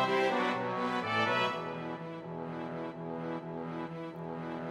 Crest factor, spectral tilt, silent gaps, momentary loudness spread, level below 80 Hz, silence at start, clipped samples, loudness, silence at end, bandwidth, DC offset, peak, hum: 18 dB; -5.5 dB/octave; none; 12 LU; -72 dBFS; 0 s; under 0.1%; -35 LUFS; 0 s; 14.5 kHz; under 0.1%; -16 dBFS; none